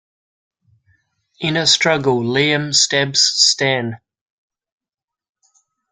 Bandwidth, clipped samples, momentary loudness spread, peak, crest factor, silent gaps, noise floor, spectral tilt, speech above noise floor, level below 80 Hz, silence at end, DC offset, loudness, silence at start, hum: 12 kHz; under 0.1%; 9 LU; 0 dBFS; 20 dB; none; -88 dBFS; -2.5 dB/octave; 71 dB; -60 dBFS; 1.95 s; under 0.1%; -14 LUFS; 1.4 s; none